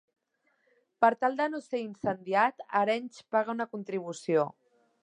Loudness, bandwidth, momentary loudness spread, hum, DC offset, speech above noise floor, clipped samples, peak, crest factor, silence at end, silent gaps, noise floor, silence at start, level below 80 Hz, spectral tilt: -30 LUFS; 10.5 kHz; 9 LU; none; under 0.1%; 45 dB; under 0.1%; -8 dBFS; 22 dB; 0.5 s; none; -75 dBFS; 1 s; -78 dBFS; -5.5 dB/octave